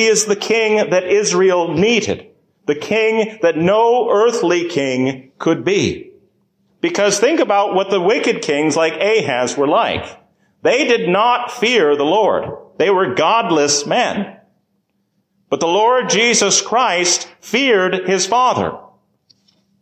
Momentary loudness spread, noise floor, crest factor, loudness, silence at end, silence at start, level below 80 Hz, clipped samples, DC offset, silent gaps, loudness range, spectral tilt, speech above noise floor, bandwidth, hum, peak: 8 LU; -66 dBFS; 14 dB; -15 LUFS; 1 s; 0 s; -52 dBFS; under 0.1%; under 0.1%; none; 3 LU; -3 dB/octave; 51 dB; 15 kHz; none; -2 dBFS